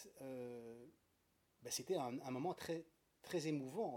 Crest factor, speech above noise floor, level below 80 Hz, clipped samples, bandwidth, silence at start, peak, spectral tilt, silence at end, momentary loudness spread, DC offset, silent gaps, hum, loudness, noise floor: 18 dB; 35 dB; -86 dBFS; under 0.1%; 18 kHz; 0 s; -30 dBFS; -4.5 dB/octave; 0 s; 16 LU; under 0.1%; none; none; -46 LUFS; -80 dBFS